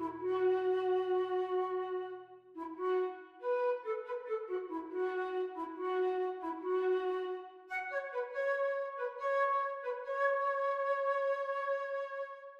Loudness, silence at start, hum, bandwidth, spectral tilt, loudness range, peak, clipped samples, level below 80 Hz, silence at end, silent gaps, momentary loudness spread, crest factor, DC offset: -36 LUFS; 0 s; none; 6.4 kHz; -5.5 dB/octave; 3 LU; -22 dBFS; under 0.1%; -82 dBFS; 0 s; none; 9 LU; 14 dB; under 0.1%